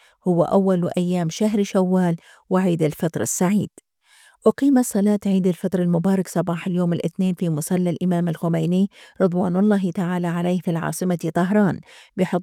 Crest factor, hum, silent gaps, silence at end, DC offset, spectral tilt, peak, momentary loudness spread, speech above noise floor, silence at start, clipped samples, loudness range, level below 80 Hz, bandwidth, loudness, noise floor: 16 dB; none; none; 0 s; under 0.1%; -7 dB/octave; -4 dBFS; 5 LU; 34 dB; 0.25 s; under 0.1%; 1 LU; -64 dBFS; 15.5 kHz; -21 LUFS; -55 dBFS